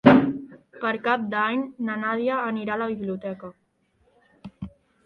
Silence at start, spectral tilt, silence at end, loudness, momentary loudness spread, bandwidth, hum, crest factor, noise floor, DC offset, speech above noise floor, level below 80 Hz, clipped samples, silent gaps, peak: 0.05 s; -8.5 dB/octave; 0.35 s; -25 LUFS; 18 LU; 5.4 kHz; none; 24 dB; -66 dBFS; under 0.1%; 40 dB; -58 dBFS; under 0.1%; none; 0 dBFS